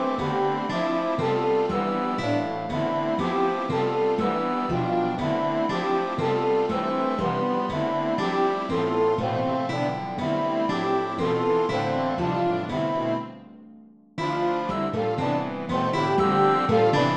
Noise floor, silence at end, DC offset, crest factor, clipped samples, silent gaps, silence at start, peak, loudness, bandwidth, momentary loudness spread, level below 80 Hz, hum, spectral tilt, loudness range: -49 dBFS; 0 s; 0.2%; 16 dB; under 0.1%; none; 0 s; -8 dBFS; -25 LUFS; 9.4 kHz; 4 LU; -58 dBFS; none; -7 dB/octave; 3 LU